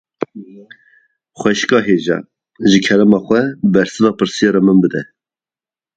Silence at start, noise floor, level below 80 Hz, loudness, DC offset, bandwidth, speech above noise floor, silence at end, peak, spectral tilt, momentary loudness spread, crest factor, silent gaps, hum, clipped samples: 0.2 s; under -90 dBFS; -54 dBFS; -14 LUFS; under 0.1%; 9 kHz; over 77 dB; 0.95 s; 0 dBFS; -5.5 dB/octave; 13 LU; 16 dB; none; none; under 0.1%